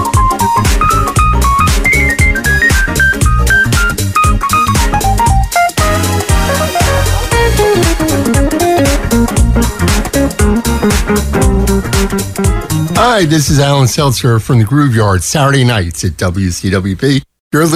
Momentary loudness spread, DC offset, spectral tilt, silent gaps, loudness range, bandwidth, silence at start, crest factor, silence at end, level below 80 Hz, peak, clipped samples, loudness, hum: 5 LU; under 0.1%; -4.5 dB/octave; 17.40-17.51 s; 2 LU; 16 kHz; 0 s; 10 dB; 0 s; -16 dBFS; 0 dBFS; under 0.1%; -11 LUFS; none